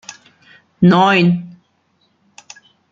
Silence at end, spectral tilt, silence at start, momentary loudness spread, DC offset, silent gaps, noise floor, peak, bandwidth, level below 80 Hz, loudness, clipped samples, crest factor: 1.45 s; -6.5 dB/octave; 0.1 s; 13 LU; under 0.1%; none; -61 dBFS; -2 dBFS; 7.4 kHz; -58 dBFS; -13 LUFS; under 0.1%; 16 dB